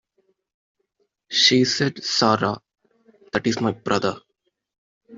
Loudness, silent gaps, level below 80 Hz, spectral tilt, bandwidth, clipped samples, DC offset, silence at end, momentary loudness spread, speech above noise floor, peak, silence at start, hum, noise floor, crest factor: -20 LUFS; 4.78-5.01 s; -62 dBFS; -3.5 dB/octave; 7.8 kHz; under 0.1%; under 0.1%; 0 s; 12 LU; 51 dB; -2 dBFS; 1.3 s; none; -72 dBFS; 22 dB